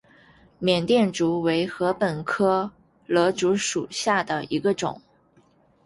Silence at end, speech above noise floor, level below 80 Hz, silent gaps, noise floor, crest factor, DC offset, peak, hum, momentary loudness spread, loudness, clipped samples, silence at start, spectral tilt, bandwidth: 0.85 s; 37 dB; -60 dBFS; none; -60 dBFS; 18 dB; under 0.1%; -6 dBFS; none; 7 LU; -23 LUFS; under 0.1%; 0.6 s; -4.5 dB/octave; 11.5 kHz